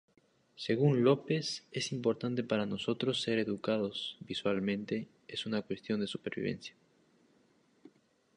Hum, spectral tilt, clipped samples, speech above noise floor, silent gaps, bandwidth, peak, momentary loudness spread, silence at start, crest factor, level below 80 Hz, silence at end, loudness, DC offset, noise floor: none; -5.5 dB/octave; under 0.1%; 36 dB; none; 11 kHz; -14 dBFS; 11 LU; 0.6 s; 20 dB; -72 dBFS; 1.65 s; -34 LUFS; under 0.1%; -69 dBFS